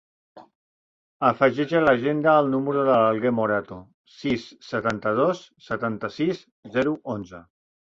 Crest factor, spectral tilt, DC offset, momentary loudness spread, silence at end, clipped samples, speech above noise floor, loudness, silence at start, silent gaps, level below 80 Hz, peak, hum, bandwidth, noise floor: 20 dB; -7 dB/octave; under 0.1%; 13 LU; 0.55 s; under 0.1%; over 67 dB; -23 LUFS; 0.35 s; 0.55-1.20 s, 3.94-4.05 s, 6.52-6.63 s; -60 dBFS; -4 dBFS; none; 7.6 kHz; under -90 dBFS